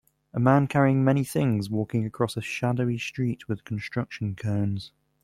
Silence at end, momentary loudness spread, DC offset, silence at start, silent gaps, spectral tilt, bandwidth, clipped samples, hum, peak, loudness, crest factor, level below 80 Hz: 0.35 s; 11 LU; under 0.1%; 0.35 s; none; -7 dB/octave; 15 kHz; under 0.1%; none; -6 dBFS; -26 LUFS; 20 dB; -58 dBFS